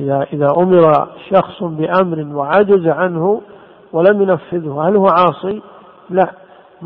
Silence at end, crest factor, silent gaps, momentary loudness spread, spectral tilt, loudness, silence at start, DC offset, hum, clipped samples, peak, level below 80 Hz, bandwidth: 0 s; 14 dB; none; 11 LU; -10.5 dB/octave; -14 LUFS; 0 s; under 0.1%; none; under 0.1%; 0 dBFS; -56 dBFS; 5.4 kHz